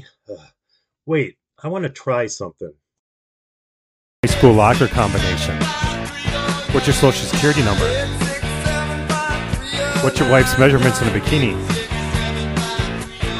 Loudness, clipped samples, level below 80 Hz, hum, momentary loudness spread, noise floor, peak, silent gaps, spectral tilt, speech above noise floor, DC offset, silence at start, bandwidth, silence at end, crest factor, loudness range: -18 LUFS; under 0.1%; -30 dBFS; none; 12 LU; -68 dBFS; 0 dBFS; 2.99-4.23 s; -5 dB/octave; 52 dB; under 0.1%; 0.3 s; 16 kHz; 0 s; 18 dB; 9 LU